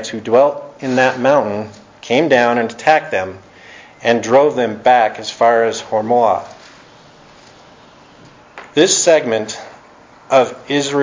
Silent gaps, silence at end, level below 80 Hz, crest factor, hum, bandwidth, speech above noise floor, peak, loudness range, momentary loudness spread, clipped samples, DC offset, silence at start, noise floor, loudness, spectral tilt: none; 0 s; -58 dBFS; 16 dB; none; 7.6 kHz; 29 dB; 0 dBFS; 4 LU; 11 LU; under 0.1%; under 0.1%; 0 s; -43 dBFS; -15 LUFS; -3.5 dB/octave